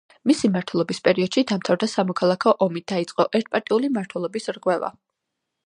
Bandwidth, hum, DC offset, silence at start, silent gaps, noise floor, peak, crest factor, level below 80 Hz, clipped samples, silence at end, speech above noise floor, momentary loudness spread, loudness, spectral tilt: 11.5 kHz; none; under 0.1%; 0.25 s; none; -81 dBFS; -4 dBFS; 20 dB; -68 dBFS; under 0.1%; 0.75 s; 59 dB; 7 LU; -22 LUFS; -5.5 dB/octave